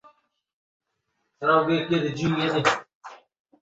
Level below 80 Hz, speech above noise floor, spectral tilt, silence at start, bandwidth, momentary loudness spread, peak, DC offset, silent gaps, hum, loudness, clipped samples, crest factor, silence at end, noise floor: -62 dBFS; 54 dB; -5.5 dB/octave; 1.4 s; 8.2 kHz; 5 LU; -6 dBFS; under 0.1%; 2.95-3.01 s; none; -23 LUFS; under 0.1%; 20 dB; 0.45 s; -77 dBFS